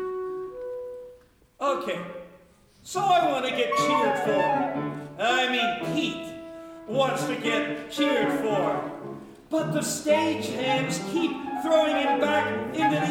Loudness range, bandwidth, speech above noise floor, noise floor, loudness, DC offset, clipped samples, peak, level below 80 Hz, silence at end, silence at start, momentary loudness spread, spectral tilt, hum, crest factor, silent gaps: 3 LU; 17.5 kHz; 30 dB; -55 dBFS; -26 LUFS; under 0.1%; under 0.1%; -10 dBFS; -64 dBFS; 0 s; 0 s; 14 LU; -4 dB/octave; none; 16 dB; none